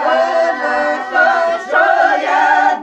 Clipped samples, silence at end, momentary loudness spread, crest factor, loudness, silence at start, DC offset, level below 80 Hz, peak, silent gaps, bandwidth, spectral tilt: under 0.1%; 0 s; 4 LU; 12 dB; -13 LUFS; 0 s; under 0.1%; -58 dBFS; 0 dBFS; none; 8.6 kHz; -2 dB/octave